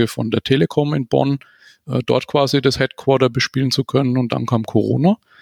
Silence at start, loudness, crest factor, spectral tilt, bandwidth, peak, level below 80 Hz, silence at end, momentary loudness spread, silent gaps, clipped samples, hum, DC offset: 0 s; -18 LUFS; 16 dB; -6 dB/octave; 16.5 kHz; -2 dBFS; -52 dBFS; 0.25 s; 4 LU; none; under 0.1%; none; under 0.1%